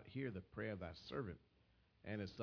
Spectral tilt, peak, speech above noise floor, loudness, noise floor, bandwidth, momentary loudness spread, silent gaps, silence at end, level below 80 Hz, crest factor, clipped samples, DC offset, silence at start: -5.5 dB/octave; -32 dBFS; 27 dB; -49 LUFS; -75 dBFS; 5.4 kHz; 7 LU; none; 0 s; -70 dBFS; 18 dB; under 0.1%; under 0.1%; 0 s